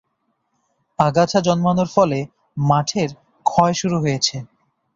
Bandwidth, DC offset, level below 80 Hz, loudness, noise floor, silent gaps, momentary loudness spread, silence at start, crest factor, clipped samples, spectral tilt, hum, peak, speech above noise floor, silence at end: 7.8 kHz; under 0.1%; -54 dBFS; -19 LUFS; -70 dBFS; none; 9 LU; 1 s; 18 dB; under 0.1%; -5.5 dB/octave; none; -2 dBFS; 53 dB; 0.5 s